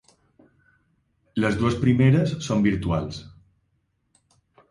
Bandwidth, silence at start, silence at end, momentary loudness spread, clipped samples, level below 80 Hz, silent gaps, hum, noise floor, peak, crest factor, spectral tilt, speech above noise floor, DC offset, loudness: 11.5 kHz; 1.35 s; 1.4 s; 14 LU; under 0.1%; -46 dBFS; none; none; -71 dBFS; -6 dBFS; 18 dB; -7 dB/octave; 50 dB; under 0.1%; -22 LUFS